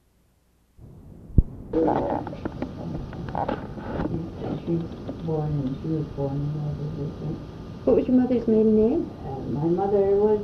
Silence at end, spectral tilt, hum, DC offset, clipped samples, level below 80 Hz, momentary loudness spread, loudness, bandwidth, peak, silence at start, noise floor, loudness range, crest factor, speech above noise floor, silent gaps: 0 s; -10 dB/octave; none; under 0.1%; under 0.1%; -36 dBFS; 13 LU; -26 LUFS; 6.4 kHz; -2 dBFS; 0.8 s; -63 dBFS; 7 LU; 24 dB; 39 dB; none